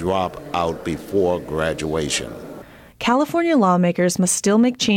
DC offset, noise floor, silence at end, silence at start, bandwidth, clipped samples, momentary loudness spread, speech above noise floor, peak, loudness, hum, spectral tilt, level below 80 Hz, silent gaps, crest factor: under 0.1%; -40 dBFS; 0 s; 0 s; 17 kHz; under 0.1%; 10 LU; 21 dB; -6 dBFS; -20 LUFS; none; -4.5 dB/octave; -46 dBFS; none; 12 dB